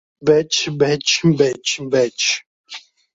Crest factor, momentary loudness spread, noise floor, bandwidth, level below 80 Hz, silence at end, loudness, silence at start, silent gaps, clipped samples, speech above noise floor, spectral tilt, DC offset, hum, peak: 16 dB; 20 LU; -39 dBFS; 8 kHz; -58 dBFS; 0.35 s; -17 LUFS; 0.2 s; 2.46-2.64 s; under 0.1%; 22 dB; -3.5 dB/octave; under 0.1%; none; -2 dBFS